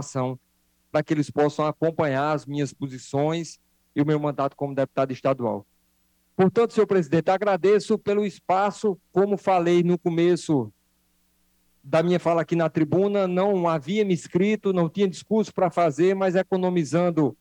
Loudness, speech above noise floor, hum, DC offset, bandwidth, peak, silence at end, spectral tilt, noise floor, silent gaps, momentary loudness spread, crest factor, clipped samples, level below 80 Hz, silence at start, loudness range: -23 LUFS; 45 dB; none; under 0.1%; 10.5 kHz; -8 dBFS; 0.05 s; -7 dB/octave; -67 dBFS; none; 8 LU; 16 dB; under 0.1%; -66 dBFS; 0 s; 4 LU